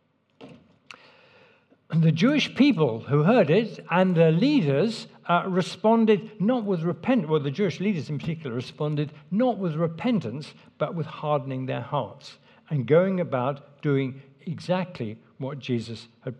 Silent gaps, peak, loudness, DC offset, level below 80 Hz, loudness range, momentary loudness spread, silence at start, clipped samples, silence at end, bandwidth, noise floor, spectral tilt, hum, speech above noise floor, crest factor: none; -6 dBFS; -25 LUFS; under 0.1%; -72 dBFS; 6 LU; 15 LU; 0.4 s; under 0.1%; 0.05 s; 9.2 kHz; -59 dBFS; -7.5 dB/octave; none; 35 dB; 18 dB